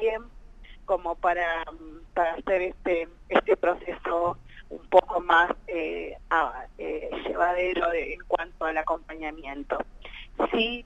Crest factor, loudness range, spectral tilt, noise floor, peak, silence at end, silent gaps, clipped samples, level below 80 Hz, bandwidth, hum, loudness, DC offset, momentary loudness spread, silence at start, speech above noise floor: 24 dB; 4 LU; -5.5 dB/octave; -46 dBFS; -4 dBFS; 0 s; none; under 0.1%; -48 dBFS; 8 kHz; none; -27 LUFS; under 0.1%; 15 LU; 0 s; 19 dB